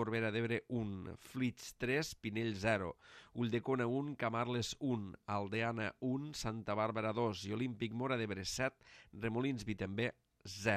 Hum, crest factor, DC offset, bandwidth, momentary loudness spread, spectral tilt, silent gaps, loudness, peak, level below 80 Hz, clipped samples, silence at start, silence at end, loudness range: none; 18 dB; under 0.1%; 14.5 kHz; 6 LU; -5.5 dB/octave; none; -39 LUFS; -20 dBFS; -66 dBFS; under 0.1%; 0 s; 0 s; 1 LU